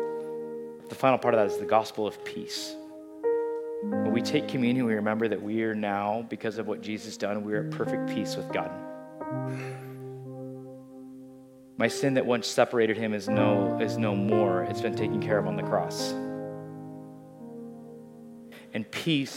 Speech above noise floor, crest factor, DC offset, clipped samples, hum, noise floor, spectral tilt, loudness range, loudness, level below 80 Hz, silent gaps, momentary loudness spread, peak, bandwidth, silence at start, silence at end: 22 dB; 22 dB; under 0.1%; under 0.1%; none; -50 dBFS; -5.5 dB/octave; 9 LU; -28 LUFS; -74 dBFS; none; 20 LU; -8 dBFS; 16.5 kHz; 0 s; 0 s